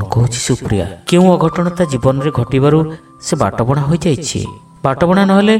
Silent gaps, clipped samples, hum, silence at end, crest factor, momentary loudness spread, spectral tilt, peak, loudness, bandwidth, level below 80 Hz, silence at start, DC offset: none; under 0.1%; none; 0 s; 12 dB; 10 LU; -6 dB/octave; 0 dBFS; -14 LUFS; 13.5 kHz; -38 dBFS; 0 s; under 0.1%